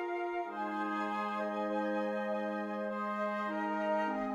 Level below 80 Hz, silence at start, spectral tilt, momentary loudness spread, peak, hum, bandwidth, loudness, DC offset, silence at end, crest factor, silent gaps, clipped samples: -74 dBFS; 0 s; -6.5 dB/octave; 4 LU; -24 dBFS; none; 11 kHz; -36 LUFS; under 0.1%; 0 s; 12 dB; none; under 0.1%